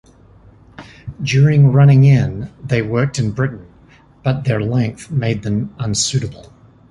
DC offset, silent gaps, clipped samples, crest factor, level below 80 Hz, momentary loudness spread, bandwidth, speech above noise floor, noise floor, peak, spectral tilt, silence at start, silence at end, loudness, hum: under 0.1%; none; under 0.1%; 14 dB; -42 dBFS; 15 LU; 11 kHz; 32 dB; -47 dBFS; -2 dBFS; -6 dB/octave; 0.8 s; 0.5 s; -16 LUFS; none